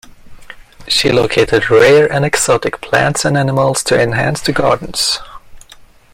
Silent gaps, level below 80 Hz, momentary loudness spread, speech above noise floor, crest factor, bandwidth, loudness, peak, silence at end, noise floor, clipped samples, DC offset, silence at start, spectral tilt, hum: none; -40 dBFS; 7 LU; 29 dB; 14 dB; 16.5 kHz; -12 LUFS; 0 dBFS; 0.55 s; -41 dBFS; under 0.1%; under 0.1%; 0.25 s; -4 dB/octave; none